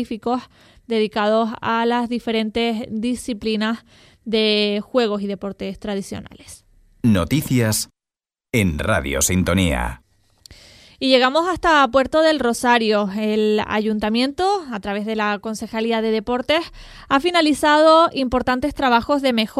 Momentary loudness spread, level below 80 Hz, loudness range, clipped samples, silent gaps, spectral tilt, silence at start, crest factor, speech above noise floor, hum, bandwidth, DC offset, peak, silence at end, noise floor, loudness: 11 LU; -40 dBFS; 5 LU; under 0.1%; none; -4.5 dB/octave; 0 s; 20 dB; 71 dB; none; 16 kHz; under 0.1%; 0 dBFS; 0 s; -90 dBFS; -19 LUFS